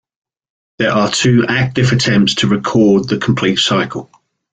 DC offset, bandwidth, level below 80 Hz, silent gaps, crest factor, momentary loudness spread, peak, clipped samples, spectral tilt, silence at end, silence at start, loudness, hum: under 0.1%; 9.4 kHz; -46 dBFS; none; 12 dB; 5 LU; -2 dBFS; under 0.1%; -5 dB/octave; 0.5 s; 0.8 s; -13 LUFS; none